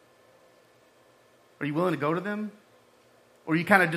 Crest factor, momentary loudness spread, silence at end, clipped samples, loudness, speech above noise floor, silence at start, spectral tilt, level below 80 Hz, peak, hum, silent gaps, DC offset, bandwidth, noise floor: 26 dB; 15 LU; 0 s; under 0.1%; -28 LUFS; 35 dB; 1.6 s; -6.5 dB/octave; -76 dBFS; -4 dBFS; none; none; under 0.1%; 15.5 kHz; -60 dBFS